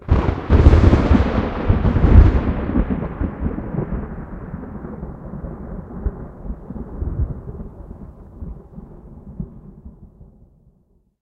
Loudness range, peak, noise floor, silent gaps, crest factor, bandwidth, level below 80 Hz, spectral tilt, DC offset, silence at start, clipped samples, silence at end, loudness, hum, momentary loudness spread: 21 LU; 0 dBFS; -59 dBFS; none; 18 dB; 6.4 kHz; -22 dBFS; -9.5 dB/octave; under 0.1%; 0.05 s; under 0.1%; 1.15 s; -18 LUFS; none; 25 LU